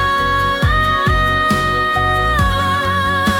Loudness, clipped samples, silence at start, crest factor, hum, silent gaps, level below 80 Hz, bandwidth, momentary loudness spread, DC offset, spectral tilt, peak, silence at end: -15 LUFS; under 0.1%; 0 s; 10 dB; none; none; -26 dBFS; 18 kHz; 2 LU; under 0.1%; -5 dB/octave; -4 dBFS; 0 s